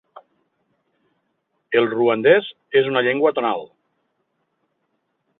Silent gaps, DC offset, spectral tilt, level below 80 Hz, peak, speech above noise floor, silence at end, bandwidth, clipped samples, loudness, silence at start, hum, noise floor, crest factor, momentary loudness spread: none; under 0.1%; -9 dB/octave; -70 dBFS; -2 dBFS; 54 dB; 1.75 s; 4.1 kHz; under 0.1%; -19 LUFS; 1.7 s; none; -72 dBFS; 20 dB; 7 LU